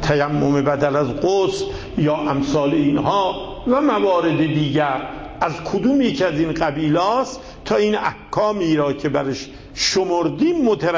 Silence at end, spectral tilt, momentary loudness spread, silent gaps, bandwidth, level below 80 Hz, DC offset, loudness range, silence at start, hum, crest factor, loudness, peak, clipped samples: 0 s; -5.5 dB/octave; 7 LU; none; 8 kHz; -42 dBFS; under 0.1%; 1 LU; 0 s; none; 14 dB; -19 LUFS; -4 dBFS; under 0.1%